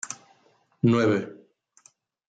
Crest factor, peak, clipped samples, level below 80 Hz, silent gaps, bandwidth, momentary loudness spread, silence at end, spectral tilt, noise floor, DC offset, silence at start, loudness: 18 dB; -10 dBFS; under 0.1%; -68 dBFS; none; 9.2 kHz; 19 LU; 0.95 s; -6 dB/octave; -64 dBFS; under 0.1%; 0.05 s; -24 LUFS